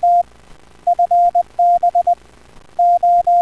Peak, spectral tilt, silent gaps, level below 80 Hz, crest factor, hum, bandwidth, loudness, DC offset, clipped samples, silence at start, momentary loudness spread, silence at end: -8 dBFS; -5 dB/octave; none; -50 dBFS; 8 dB; none; 6 kHz; -15 LUFS; 0.3%; under 0.1%; 0 s; 10 LU; 0 s